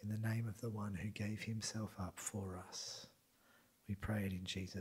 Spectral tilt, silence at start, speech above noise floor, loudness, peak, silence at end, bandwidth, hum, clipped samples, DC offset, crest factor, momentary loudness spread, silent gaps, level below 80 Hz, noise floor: -5 dB/octave; 0 s; 28 dB; -45 LUFS; -30 dBFS; 0 s; 16 kHz; none; under 0.1%; under 0.1%; 16 dB; 7 LU; none; -66 dBFS; -72 dBFS